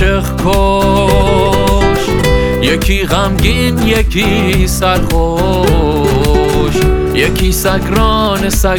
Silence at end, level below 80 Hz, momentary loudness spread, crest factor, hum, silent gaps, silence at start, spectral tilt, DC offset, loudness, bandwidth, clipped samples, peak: 0 s; -16 dBFS; 2 LU; 10 dB; none; none; 0 s; -5 dB/octave; under 0.1%; -11 LUFS; 19.5 kHz; under 0.1%; 0 dBFS